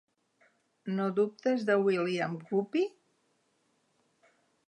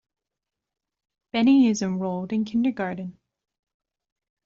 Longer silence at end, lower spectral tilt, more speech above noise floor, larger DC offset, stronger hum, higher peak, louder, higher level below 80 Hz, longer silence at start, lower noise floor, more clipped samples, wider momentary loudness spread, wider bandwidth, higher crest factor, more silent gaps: first, 1.8 s vs 1.35 s; first, -7 dB/octave vs -5.5 dB/octave; second, 44 dB vs 64 dB; neither; neither; second, -14 dBFS vs -10 dBFS; second, -31 LUFS vs -23 LUFS; second, -86 dBFS vs -66 dBFS; second, 0.85 s vs 1.35 s; second, -74 dBFS vs -87 dBFS; neither; second, 8 LU vs 13 LU; first, 9.2 kHz vs 7.6 kHz; about the same, 18 dB vs 16 dB; neither